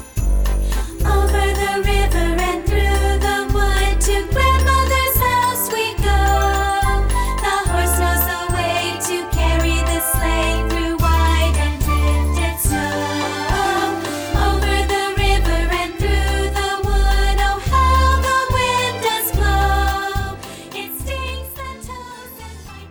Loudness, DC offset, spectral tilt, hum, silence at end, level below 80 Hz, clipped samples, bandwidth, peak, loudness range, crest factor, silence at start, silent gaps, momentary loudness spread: -18 LUFS; under 0.1%; -4.5 dB/octave; none; 0 s; -20 dBFS; under 0.1%; over 20 kHz; -4 dBFS; 2 LU; 14 dB; 0 s; none; 10 LU